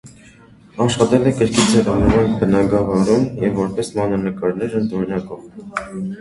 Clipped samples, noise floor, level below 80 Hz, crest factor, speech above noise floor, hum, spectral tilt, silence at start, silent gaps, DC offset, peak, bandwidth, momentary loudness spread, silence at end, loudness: under 0.1%; -45 dBFS; -36 dBFS; 18 dB; 28 dB; none; -6 dB/octave; 0.05 s; none; under 0.1%; 0 dBFS; 11.5 kHz; 13 LU; 0 s; -17 LUFS